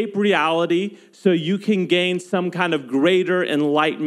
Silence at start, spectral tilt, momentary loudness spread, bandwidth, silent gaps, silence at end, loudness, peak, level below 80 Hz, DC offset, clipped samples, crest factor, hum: 0 s; -6 dB/octave; 5 LU; 12 kHz; none; 0 s; -19 LUFS; -4 dBFS; -82 dBFS; under 0.1%; under 0.1%; 16 dB; none